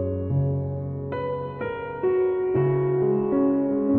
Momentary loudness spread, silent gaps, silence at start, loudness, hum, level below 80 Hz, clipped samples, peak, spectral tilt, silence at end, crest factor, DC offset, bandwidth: 8 LU; none; 0 s; -25 LUFS; none; -52 dBFS; under 0.1%; -10 dBFS; -12.5 dB/octave; 0 s; 12 dB; under 0.1%; 4 kHz